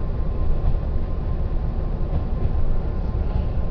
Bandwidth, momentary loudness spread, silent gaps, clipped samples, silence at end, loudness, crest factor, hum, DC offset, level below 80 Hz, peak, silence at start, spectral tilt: 5 kHz; 2 LU; none; under 0.1%; 0 s; -27 LUFS; 12 dB; none; under 0.1%; -22 dBFS; -8 dBFS; 0 s; -10.5 dB/octave